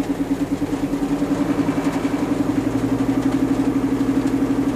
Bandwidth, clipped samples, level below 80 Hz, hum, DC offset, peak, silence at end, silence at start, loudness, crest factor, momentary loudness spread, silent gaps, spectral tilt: 15 kHz; under 0.1%; -40 dBFS; none; under 0.1%; -8 dBFS; 0 s; 0 s; -21 LUFS; 12 dB; 3 LU; none; -7 dB/octave